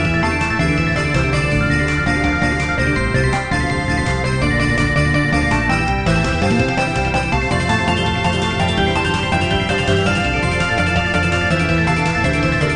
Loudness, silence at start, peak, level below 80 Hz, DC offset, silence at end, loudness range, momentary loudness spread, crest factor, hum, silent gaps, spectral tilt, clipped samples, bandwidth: -17 LUFS; 0 s; -4 dBFS; -26 dBFS; 0.8%; 0 s; 1 LU; 2 LU; 12 dB; none; none; -5.5 dB/octave; under 0.1%; 11 kHz